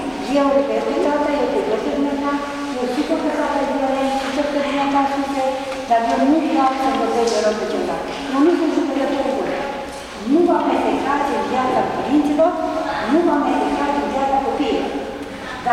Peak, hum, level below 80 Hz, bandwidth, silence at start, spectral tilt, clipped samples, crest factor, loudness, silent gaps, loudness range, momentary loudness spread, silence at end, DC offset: -6 dBFS; none; -46 dBFS; 13.5 kHz; 0 s; -4.5 dB/octave; under 0.1%; 12 dB; -19 LUFS; none; 2 LU; 7 LU; 0 s; under 0.1%